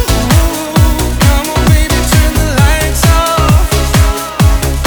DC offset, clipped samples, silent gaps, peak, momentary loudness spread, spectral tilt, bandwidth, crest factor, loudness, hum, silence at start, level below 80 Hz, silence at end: under 0.1%; 0.2%; none; 0 dBFS; 2 LU; -4.5 dB/octave; over 20 kHz; 8 dB; -10 LUFS; none; 0 s; -12 dBFS; 0 s